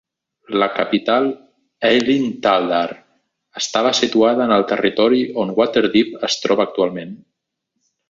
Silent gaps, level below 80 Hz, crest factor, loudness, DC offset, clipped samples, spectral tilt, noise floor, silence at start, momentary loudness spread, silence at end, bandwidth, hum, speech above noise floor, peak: none; -58 dBFS; 18 dB; -17 LUFS; under 0.1%; under 0.1%; -4 dB/octave; -76 dBFS; 0.5 s; 8 LU; 0.95 s; 7.8 kHz; none; 59 dB; 0 dBFS